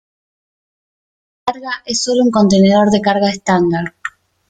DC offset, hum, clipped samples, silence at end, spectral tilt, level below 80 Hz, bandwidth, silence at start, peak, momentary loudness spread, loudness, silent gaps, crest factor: under 0.1%; none; under 0.1%; 0.4 s; -5 dB/octave; -50 dBFS; 9.2 kHz; 1.45 s; 0 dBFS; 14 LU; -14 LUFS; none; 16 dB